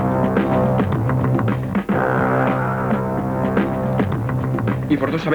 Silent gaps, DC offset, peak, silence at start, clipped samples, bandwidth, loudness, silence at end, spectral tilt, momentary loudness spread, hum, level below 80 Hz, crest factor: none; under 0.1%; -4 dBFS; 0 s; under 0.1%; 19.5 kHz; -19 LUFS; 0 s; -9 dB/octave; 4 LU; none; -40 dBFS; 14 dB